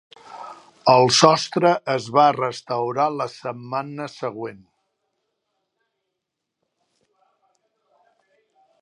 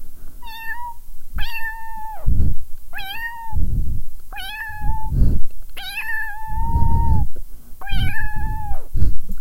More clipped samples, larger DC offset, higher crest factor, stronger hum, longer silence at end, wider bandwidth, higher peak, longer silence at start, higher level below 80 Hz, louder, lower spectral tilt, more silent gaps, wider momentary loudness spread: neither; neither; first, 22 dB vs 14 dB; neither; first, 4.25 s vs 0 s; second, 11.5 kHz vs 15.5 kHz; about the same, 0 dBFS vs 0 dBFS; first, 0.3 s vs 0 s; second, -68 dBFS vs -22 dBFS; first, -19 LUFS vs -26 LUFS; second, -4 dB/octave vs -5.5 dB/octave; neither; first, 20 LU vs 15 LU